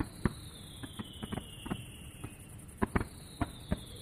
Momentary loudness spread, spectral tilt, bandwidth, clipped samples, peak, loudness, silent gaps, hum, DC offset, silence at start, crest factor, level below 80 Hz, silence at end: 12 LU; -5.5 dB/octave; 15.5 kHz; under 0.1%; -12 dBFS; -41 LUFS; none; none; under 0.1%; 0 s; 26 dB; -48 dBFS; 0 s